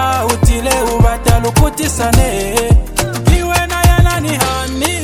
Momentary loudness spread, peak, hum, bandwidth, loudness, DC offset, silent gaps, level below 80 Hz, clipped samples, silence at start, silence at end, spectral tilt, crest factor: 4 LU; 0 dBFS; none; 17.5 kHz; -13 LUFS; under 0.1%; none; -16 dBFS; under 0.1%; 0 s; 0 s; -4.5 dB/octave; 12 dB